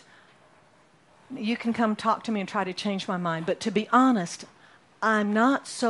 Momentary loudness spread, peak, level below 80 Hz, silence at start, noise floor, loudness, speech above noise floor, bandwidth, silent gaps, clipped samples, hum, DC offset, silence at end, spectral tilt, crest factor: 12 LU; -8 dBFS; -72 dBFS; 1.3 s; -59 dBFS; -26 LUFS; 34 dB; 11.5 kHz; none; under 0.1%; none; under 0.1%; 0 s; -5 dB/octave; 20 dB